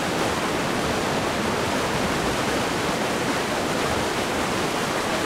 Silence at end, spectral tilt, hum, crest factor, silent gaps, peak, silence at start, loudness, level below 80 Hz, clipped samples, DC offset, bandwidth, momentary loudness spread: 0 s; -3.5 dB/octave; none; 14 dB; none; -10 dBFS; 0 s; -24 LUFS; -44 dBFS; under 0.1%; under 0.1%; 16 kHz; 1 LU